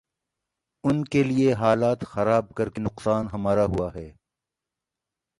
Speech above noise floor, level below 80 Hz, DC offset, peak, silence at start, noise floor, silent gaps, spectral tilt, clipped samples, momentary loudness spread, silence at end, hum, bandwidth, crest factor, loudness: 64 dB; -48 dBFS; under 0.1%; -6 dBFS; 0.85 s; -87 dBFS; none; -7.5 dB/octave; under 0.1%; 9 LU; 1.3 s; none; 11.5 kHz; 18 dB; -24 LUFS